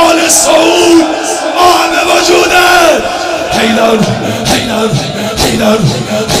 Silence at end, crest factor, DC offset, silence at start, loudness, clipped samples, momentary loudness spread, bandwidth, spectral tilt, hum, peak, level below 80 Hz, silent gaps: 0 s; 8 dB; under 0.1%; 0 s; -8 LUFS; 2%; 8 LU; over 20 kHz; -3.5 dB/octave; none; 0 dBFS; -34 dBFS; none